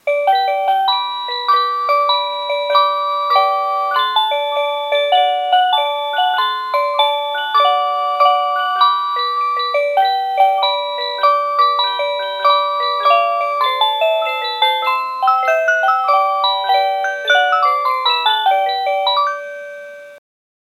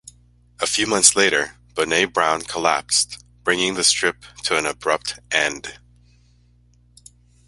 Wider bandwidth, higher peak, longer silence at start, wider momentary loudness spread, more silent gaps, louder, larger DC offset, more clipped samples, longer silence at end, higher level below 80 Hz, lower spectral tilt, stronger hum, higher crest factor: about the same, 14 kHz vs 14.5 kHz; about the same, 0 dBFS vs 0 dBFS; second, 0.05 s vs 0.6 s; second, 5 LU vs 12 LU; neither; first, -15 LUFS vs -19 LUFS; neither; neither; second, 0.6 s vs 1.7 s; second, -90 dBFS vs -54 dBFS; second, 1 dB/octave vs -1 dB/octave; second, none vs 60 Hz at -50 dBFS; second, 16 dB vs 22 dB